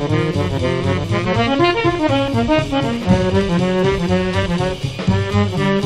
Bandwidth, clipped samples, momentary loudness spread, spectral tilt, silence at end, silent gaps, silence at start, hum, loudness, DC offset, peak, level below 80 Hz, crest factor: 11.5 kHz; under 0.1%; 4 LU; -6.5 dB/octave; 0 s; none; 0 s; none; -17 LUFS; under 0.1%; -2 dBFS; -34 dBFS; 16 dB